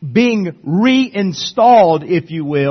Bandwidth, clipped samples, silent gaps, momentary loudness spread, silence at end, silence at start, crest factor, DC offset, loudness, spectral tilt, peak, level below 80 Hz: 6.4 kHz; under 0.1%; none; 10 LU; 0 s; 0 s; 12 dB; under 0.1%; -13 LUFS; -6 dB/octave; 0 dBFS; -56 dBFS